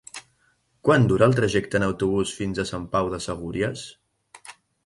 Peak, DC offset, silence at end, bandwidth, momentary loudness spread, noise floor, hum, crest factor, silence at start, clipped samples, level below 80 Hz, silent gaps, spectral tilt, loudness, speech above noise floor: -6 dBFS; under 0.1%; 0.35 s; 11.5 kHz; 22 LU; -66 dBFS; none; 20 dB; 0.15 s; under 0.1%; -48 dBFS; none; -6 dB/octave; -23 LUFS; 44 dB